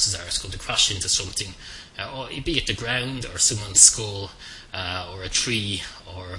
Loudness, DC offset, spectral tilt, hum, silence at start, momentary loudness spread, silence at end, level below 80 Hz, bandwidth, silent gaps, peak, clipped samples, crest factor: -21 LUFS; under 0.1%; -1 dB/octave; none; 0 s; 21 LU; 0 s; -44 dBFS; 12 kHz; none; 0 dBFS; under 0.1%; 24 dB